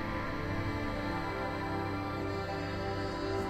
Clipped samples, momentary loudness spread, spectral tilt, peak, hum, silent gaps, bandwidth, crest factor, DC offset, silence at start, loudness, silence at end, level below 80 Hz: under 0.1%; 1 LU; -6.5 dB/octave; -22 dBFS; none; none; 15 kHz; 14 dB; under 0.1%; 0 s; -36 LUFS; 0 s; -46 dBFS